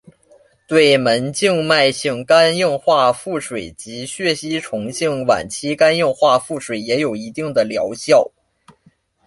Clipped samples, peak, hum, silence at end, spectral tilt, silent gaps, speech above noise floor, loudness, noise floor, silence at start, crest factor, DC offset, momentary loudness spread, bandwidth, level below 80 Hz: under 0.1%; -2 dBFS; none; 1 s; -4 dB/octave; none; 40 dB; -17 LUFS; -56 dBFS; 0.7 s; 16 dB; under 0.1%; 12 LU; 11.5 kHz; -56 dBFS